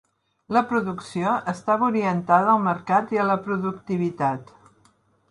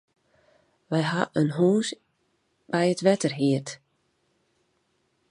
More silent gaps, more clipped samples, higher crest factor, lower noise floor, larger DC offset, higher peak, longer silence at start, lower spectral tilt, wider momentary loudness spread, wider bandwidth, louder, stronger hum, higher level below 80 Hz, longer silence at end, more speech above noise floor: neither; neither; about the same, 18 dB vs 22 dB; second, -61 dBFS vs -72 dBFS; neither; about the same, -4 dBFS vs -6 dBFS; second, 0.5 s vs 0.9 s; first, -7.5 dB/octave vs -6 dB/octave; second, 8 LU vs 13 LU; about the same, 11 kHz vs 11 kHz; about the same, -23 LUFS vs -25 LUFS; neither; first, -66 dBFS vs -72 dBFS; second, 0.85 s vs 1.55 s; second, 39 dB vs 48 dB